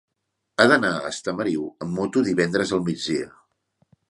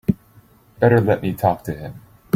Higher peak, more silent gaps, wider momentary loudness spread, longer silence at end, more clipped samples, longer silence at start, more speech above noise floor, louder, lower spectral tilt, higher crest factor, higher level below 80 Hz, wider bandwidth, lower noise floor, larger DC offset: about the same, 0 dBFS vs -2 dBFS; neither; second, 11 LU vs 15 LU; first, 0.8 s vs 0.4 s; neither; first, 0.6 s vs 0.1 s; first, 56 dB vs 33 dB; second, -23 LUFS vs -19 LUFS; second, -5 dB/octave vs -8.5 dB/octave; first, 24 dB vs 18 dB; second, -60 dBFS vs -48 dBFS; second, 11.5 kHz vs 16 kHz; first, -78 dBFS vs -51 dBFS; neither